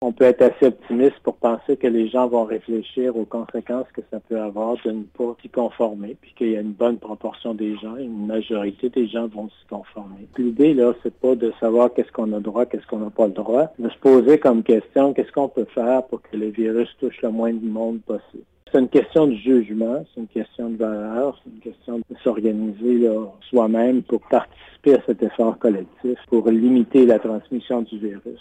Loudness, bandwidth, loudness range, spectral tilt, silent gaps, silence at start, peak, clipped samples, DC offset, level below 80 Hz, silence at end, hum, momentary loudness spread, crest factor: -20 LUFS; 8.8 kHz; 7 LU; -8 dB/octave; none; 0 s; -4 dBFS; under 0.1%; under 0.1%; -60 dBFS; 0.05 s; none; 14 LU; 16 dB